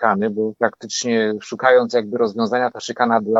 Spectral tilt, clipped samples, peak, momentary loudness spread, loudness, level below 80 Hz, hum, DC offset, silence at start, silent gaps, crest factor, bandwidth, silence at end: -4 dB/octave; under 0.1%; 0 dBFS; 7 LU; -19 LUFS; -72 dBFS; none; under 0.1%; 0 s; none; 18 dB; 8 kHz; 0 s